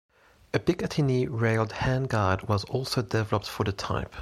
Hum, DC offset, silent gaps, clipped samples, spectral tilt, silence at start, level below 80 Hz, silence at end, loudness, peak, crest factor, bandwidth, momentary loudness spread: none; under 0.1%; none; under 0.1%; -6.5 dB/octave; 0.55 s; -48 dBFS; 0 s; -28 LUFS; -8 dBFS; 20 dB; 14.5 kHz; 4 LU